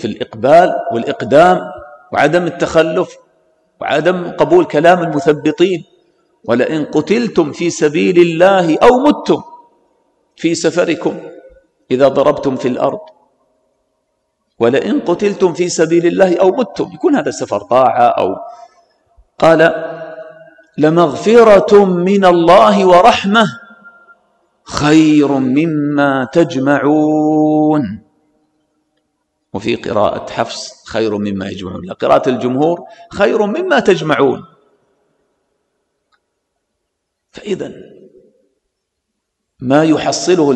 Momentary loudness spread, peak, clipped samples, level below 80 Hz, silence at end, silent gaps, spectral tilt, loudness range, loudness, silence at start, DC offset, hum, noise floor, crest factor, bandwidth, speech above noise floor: 14 LU; 0 dBFS; under 0.1%; -48 dBFS; 0 s; none; -5.5 dB/octave; 9 LU; -12 LUFS; 0 s; under 0.1%; none; -73 dBFS; 14 dB; 11 kHz; 61 dB